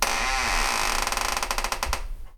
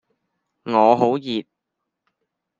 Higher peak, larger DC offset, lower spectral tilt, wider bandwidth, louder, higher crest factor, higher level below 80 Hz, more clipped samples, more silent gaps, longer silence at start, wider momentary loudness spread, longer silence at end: about the same, -4 dBFS vs -2 dBFS; neither; second, -1 dB/octave vs -7 dB/octave; first, 19.5 kHz vs 7.6 kHz; second, -25 LUFS vs -19 LUFS; about the same, 22 dB vs 22 dB; first, -32 dBFS vs -72 dBFS; neither; neither; second, 0 s vs 0.65 s; second, 6 LU vs 13 LU; second, 0 s vs 1.2 s